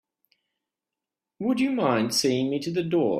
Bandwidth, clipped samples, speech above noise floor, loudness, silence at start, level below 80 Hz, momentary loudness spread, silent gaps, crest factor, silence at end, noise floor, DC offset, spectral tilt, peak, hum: 15.5 kHz; under 0.1%; 64 dB; -25 LUFS; 1.4 s; -68 dBFS; 5 LU; none; 18 dB; 0 s; -88 dBFS; under 0.1%; -4.5 dB/octave; -8 dBFS; none